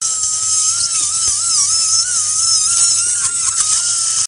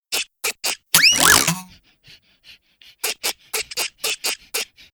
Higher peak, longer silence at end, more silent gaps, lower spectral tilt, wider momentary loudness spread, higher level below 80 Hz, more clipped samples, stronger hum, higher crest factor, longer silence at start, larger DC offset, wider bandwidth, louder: about the same, 0 dBFS vs 0 dBFS; second, 0 s vs 0.3 s; neither; second, 3 dB/octave vs 0 dB/octave; second, 3 LU vs 14 LU; about the same, -52 dBFS vs -52 dBFS; neither; neither; second, 16 dB vs 22 dB; about the same, 0 s vs 0.1 s; first, 0.1% vs under 0.1%; second, 10.5 kHz vs over 20 kHz; first, -12 LUFS vs -18 LUFS